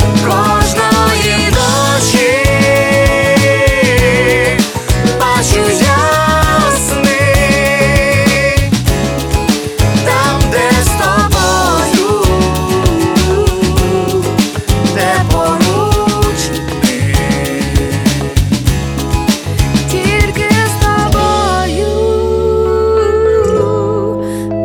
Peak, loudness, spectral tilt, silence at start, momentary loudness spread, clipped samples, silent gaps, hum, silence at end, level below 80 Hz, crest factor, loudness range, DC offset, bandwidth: 0 dBFS; -11 LUFS; -4.5 dB/octave; 0 s; 5 LU; under 0.1%; none; none; 0 s; -20 dBFS; 10 dB; 3 LU; under 0.1%; over 20 kHz